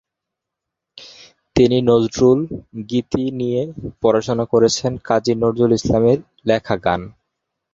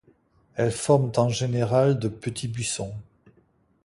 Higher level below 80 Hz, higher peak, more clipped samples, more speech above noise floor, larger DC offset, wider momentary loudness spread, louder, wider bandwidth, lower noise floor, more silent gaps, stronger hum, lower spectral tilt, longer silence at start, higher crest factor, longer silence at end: first, -44 dBFS vs -56 dBFS; first, 0 dBFS vs -6 dBFS; neither; first, 65 dB vs 40 dB; neither; second, 9 LU vs 12 LU; first, -18 LUFS vs -24 LUFS; second, 7.8 kHz vs 11.5 kHz; first, -82 dBFS vs -63 dBFS; neither; neither; about the same, -6 dB/octave vs -5.5 dB/octave; first, 0.95 s vs 0.55 s; about the same, 18 dB vs 20 dB; second, 0.65 s vs 0.85 s